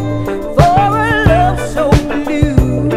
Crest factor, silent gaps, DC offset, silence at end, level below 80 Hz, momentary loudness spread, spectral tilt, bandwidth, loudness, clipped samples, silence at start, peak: 12 dB; none; under 0.1%; 0 s; -20 dBFS; 7 LU; -7 dB/octave; 15.5 kHz; -12 LUFS; 1%; 0 s; 0 dBFS